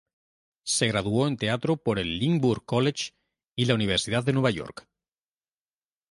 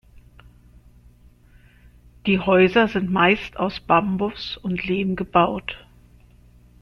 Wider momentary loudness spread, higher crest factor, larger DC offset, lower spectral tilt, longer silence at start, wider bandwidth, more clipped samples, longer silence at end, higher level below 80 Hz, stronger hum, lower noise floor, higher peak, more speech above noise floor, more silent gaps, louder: second, 10 LU vs 13 LU; about the same, 20 dB vs 20 dB; neither; second, -5 dB/octave vs -7.5 dB/octave; first, 0.65 s vs 0.15 s; first, 11.5 kHz vs 6.4 kHz; neither; first, 1.3 s vs 1.05 s; second, -54 dBFS vs -48 dBFS; second, none vs 60 Hz at -45 dBFS; first, under -90 dBFS vs -52 dBFS; about the same, -6 dBFS vs -4 dBFS; first, over 65 dB vs 31 dB; first, 3.48-3.55 s vs none; second, -26 LUFS vs -20 LUFS